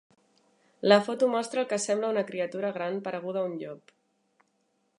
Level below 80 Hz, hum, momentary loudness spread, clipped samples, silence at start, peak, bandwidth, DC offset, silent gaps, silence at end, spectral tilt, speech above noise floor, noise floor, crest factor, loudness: -84 dBFS; none; 12 LU; under 0.1%; 0.85 s; -4 dBFS; 11.5 kHz; under 0.1%; none; 1.2 s; -4 dB/octave; 46 dB; -74 dBFS; 24 dB; -28 LUFS